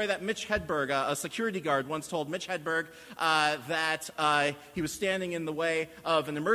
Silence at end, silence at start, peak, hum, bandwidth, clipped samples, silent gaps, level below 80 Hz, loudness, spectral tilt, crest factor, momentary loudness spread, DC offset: 0 s; 0 s; -10 dBFS; none; 16 kHz; under 0.1%; none; -60 dBFS; -30 LUFS; -3.5 dB/octave; 20 dB; 8 LU; under 0.1%